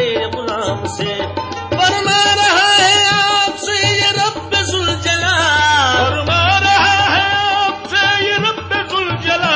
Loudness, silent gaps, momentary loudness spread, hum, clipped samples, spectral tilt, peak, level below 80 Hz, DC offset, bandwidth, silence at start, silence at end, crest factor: -13 LUFS; none; 10 LU; none; under 0.1%; -2.5 dB/octave; 0 dBFS; -36 dBFS; under 0.1%; 8 kHz; 0 s; 0 s; 14 dB